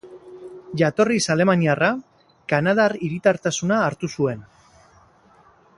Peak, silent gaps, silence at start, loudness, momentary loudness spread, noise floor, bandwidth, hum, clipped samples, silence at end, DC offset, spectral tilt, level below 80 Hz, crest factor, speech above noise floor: -2 dBFS; none; 0.05 s; -20 LUFS; 18 LU; -54 dBFS; 11.5 kHz; none; under 0.1%; 1.35 s; under 0.1%; -5 dB/octave; -60 dBFS; 20 dB; 34 dB